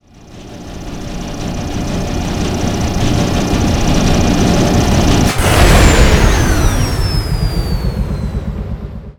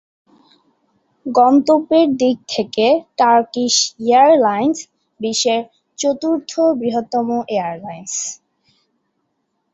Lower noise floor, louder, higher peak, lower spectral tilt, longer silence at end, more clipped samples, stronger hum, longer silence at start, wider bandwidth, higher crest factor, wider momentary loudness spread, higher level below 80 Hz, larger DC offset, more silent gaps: second, -35 dBFS vs -70 dBFS; about the same, -14 LUFS vs -16 LUFS; about the same, 0 dBFS vs -2 dBFS; first, -5 dB/octave vs -3 dB/octave; second, 0.05 s vs 1.4 s; first, 0.3% vs under 0.1%; neither; second, 0.25 s vs 1.25 s; first, over 20 kHz vs 8.2 kHz; about the same, 12 dB vs 16 dB; about the same, 15 LU vs 14 LU; first, -18 dBFS vs -64 dBFS; first, 0.3% vs under 0.1%; neither